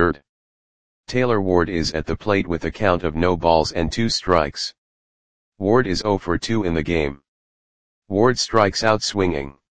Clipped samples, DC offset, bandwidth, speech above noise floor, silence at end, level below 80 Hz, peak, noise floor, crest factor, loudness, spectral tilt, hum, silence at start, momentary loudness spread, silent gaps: under 0.1%; 1%; 9.8 kHz; over 70 dB; 0 s; -40 dBFS; 0 dBFS; under -90 dBFS; 20 dB; -20 LUFS; -5 dB/octave; none; 0 s; 8 LU; 0.29-1.04 s, 4.78-5.52 s, 7.28-8.02 s